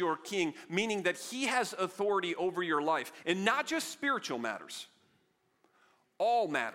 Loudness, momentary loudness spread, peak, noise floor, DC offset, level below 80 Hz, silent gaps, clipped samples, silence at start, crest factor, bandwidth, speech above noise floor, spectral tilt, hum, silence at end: -33 LUFS; 7 LU; -12 dBFS; -74 dBFS; under 0.1%; -82 dBFS; none; under 0.1%; 0 s; 22 dB; 16.5 kHz; 41 dB; -3.5 dB/octave; none; 0 s